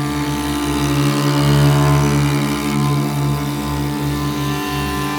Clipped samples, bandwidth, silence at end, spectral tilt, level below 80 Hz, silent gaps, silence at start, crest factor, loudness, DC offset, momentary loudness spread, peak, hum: under 0.1%; 20 kHz; 0 s; -5.5 dB/octave; -32 dBFS; none; 0 s; 14 dB; -17 LUFS; under 0.1%; 7 LU; -2 dBFS; none